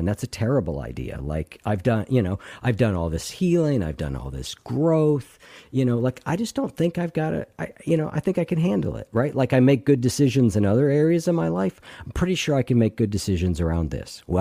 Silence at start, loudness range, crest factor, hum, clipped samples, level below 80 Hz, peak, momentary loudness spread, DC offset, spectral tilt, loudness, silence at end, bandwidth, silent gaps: 0 s; 4 LU; 16 dB; none; under 0.1%; -40 dBFS; -8 dBFS; 11 LU; under 0.1%; -7 dB/octave; -23 LUFS; 0 s; 15.5 kHz; none